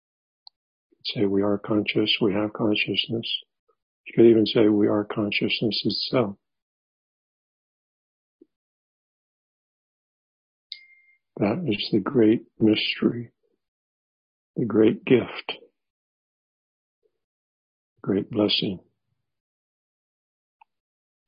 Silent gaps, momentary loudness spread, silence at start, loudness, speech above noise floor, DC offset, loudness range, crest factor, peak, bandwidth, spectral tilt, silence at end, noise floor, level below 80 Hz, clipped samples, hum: 3.59-3.67 s, 3.83-4.04 s, 6.62-8.39 s, 8.56-10.70 s, 13.68-14.54 s, 15.90-17.02 s, 17.24-17.96 s; 16 LU; 1.05 s; -23 LUFS; 56 dB; under 0.1%; 8 LU; 22 dB; -6 dBFS; 5.4 kHz; -10 dB/octave; 2.5 s; -79 dBFS; -62 dBFS; under 0.1%; none